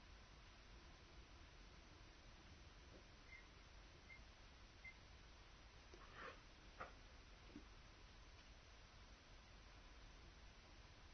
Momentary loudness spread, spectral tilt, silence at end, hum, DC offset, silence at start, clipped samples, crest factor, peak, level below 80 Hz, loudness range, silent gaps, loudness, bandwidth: 6 LU; -3 dB/octave; 0 s; none; under 0.1%; 0 s; under 0.1%; 22 dB; -40 dBFS; -66 dBFS; 3 LU; none; -63 LUFS; 6.4 kHz